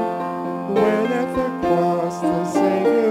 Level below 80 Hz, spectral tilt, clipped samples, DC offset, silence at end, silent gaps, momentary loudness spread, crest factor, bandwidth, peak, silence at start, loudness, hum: -52 dBFS; -7 dB/octave; under 0.1%; under 0.1%; 0 s; none; 7 LU; 14 dB; 17 kHz; -6 dBFS; 0 s; -20 LUFS; none